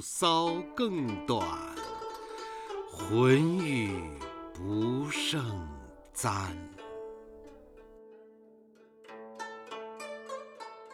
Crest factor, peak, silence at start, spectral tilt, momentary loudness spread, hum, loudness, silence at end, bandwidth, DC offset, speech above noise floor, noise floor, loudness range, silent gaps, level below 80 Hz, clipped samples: 22 dB; -10 dBFS; 0 s; -5 dB/octave; 20 LU; none; -32 LUFS; 0 s; 17 kHz; under 0.1%; 29 dB; -59 dBFS; 16 LU; none; -58 dBFS; under 0.1%